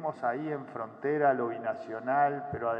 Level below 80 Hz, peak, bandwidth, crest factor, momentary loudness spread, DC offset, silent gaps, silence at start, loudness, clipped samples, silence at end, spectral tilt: -72 dBFS; -14 dBFS; 5.4 kHz; 16 dB; 9 LU; under 0.1%; none; 0 s; -31 LUFS; under 0.1%; 0 s; -9 dB/octave